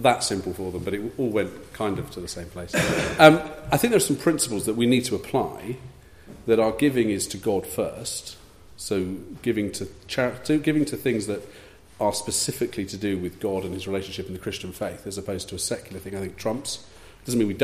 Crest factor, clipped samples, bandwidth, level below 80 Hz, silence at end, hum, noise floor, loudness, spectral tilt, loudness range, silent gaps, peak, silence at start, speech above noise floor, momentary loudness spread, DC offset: 24 dB; under 0.1%; 15.5 kHz; -50 dBFS; 0 s; none; -46 dBFS; -25 LUFS; -4.5 dB/octave; 9 LU; none; 0 dBFS; 0 s; 21 dB; 13 LU; under 0.1%